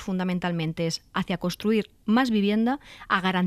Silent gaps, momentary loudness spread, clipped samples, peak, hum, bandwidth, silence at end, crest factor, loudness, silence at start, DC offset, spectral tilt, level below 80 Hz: none; 7 LU; under 0.1%; -8 dBFS; none; 14.5 kHz; 0 s; 18 dB; -26 LUFS; 0 s; under 0.1%; -6 dB/octave; -56 dBFS